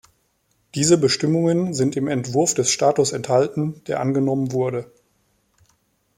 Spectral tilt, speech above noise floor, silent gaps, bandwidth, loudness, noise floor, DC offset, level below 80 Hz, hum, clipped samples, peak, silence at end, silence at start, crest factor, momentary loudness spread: -4.5 dB/octave; 47 dB; none; 16 kHz; -20 LUFS; -66 dBFS; under 0.1%; -60 dBFS; none; under 0.1%; -4 dBFS; 1.3 s; 0.75 s; 18 dB; 8 LU